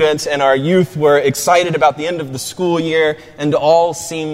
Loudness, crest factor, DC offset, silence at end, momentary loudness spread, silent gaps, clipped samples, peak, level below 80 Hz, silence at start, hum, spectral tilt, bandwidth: -14 LUFS; 14 dB; under 0.1%; 0 s; 9 LU; none; under 0.1%; 0 dBFS; -54 dBFS; 0 s; none; -4.5 dB/octave; 16 kHz